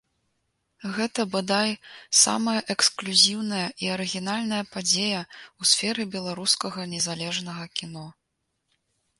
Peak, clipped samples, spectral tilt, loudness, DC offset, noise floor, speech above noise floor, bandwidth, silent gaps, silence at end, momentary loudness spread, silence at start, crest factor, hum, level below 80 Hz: -4 dBFS; under 0.1%; -2 dB/octave; -24 LUFS; under 0.1%; -78 dBFS; 52 dB; 11.5 kHz; none; 1.1 s; 14 LU; 0.8 s; 24 dB; none; -70 dBFS